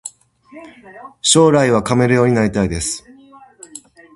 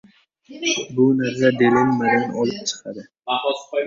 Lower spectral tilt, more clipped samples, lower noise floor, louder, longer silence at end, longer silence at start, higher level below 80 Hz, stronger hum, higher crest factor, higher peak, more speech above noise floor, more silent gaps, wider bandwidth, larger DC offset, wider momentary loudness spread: about the same, -4.5 dB/octave vs -4.5 dB/octave; neither; about the same, -44 dBFS vs -47 dBFS; first, -14 LUFS vs -20 LUFS; first, 0.35 s vs 0 s; second, 0.05 s vs 0.5 s; first, -42 dBFS vs -60 dBFS; neither; about the same, 18 dB vs 18 dB; about the same, 0 dBFS vs -2 dBFS; about the same, 29 dB vs 27 dB; neither; first, 11.5 kHz vs 7.6 kHz; neither; first, 25 LU vs 11 LU